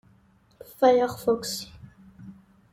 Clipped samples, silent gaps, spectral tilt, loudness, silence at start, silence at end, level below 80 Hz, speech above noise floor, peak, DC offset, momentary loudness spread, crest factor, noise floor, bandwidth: under 0.1%; none; -4 dB/octave; -24 LUFS; 0.8 s; 0.4 s; -60 dBFS; 37 dB; -8 dBFS; under 0.1%; 21 LU; 20 dB; -60 dBFS; 16.5 kHz